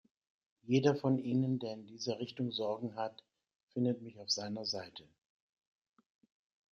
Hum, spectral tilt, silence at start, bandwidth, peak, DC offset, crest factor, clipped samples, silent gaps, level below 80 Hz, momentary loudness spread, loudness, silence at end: none; -5.5 dB/octave; 0.65 s; 7.4 kHz; -16 dBFS; under 0.1%; 22 dB; under 0.1%; 3.56-3.67 s; -80 dBFS; 12 LU; -36 LUFS; 1.7 s